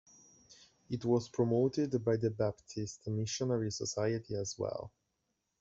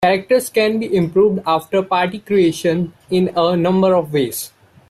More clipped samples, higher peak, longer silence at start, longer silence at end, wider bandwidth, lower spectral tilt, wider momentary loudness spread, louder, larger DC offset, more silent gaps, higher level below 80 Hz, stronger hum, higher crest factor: neither; second, -18 dBFS vs -4 dBFS; first, 0.5 s vs 0 s; first, 0.75 s vs 0.4 s; second, 8 kHz vs 14.5 kHz; about the same, -6 dB/octave vs -5.5 dB/octave; first, 11 LU vs 5 LU; second, -35 LUFS vs -17 LUFS; neither; neither; second, -68 dBFS vs -54 dBFS; neither; first, 18 dB vs 12 dB